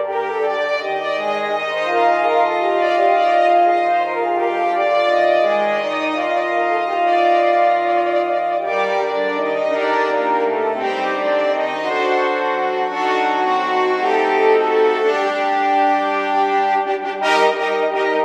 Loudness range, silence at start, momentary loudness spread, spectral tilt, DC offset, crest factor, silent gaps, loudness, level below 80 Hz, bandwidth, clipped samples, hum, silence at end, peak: 3 LU; 0 s; 5 LU; -4 dB/octave; under 0.1%; 14 dB; none; -17 LUFS; -76 dBFS; 9.8 kHz; under 0.1%; none; 0 s; -2 dBFS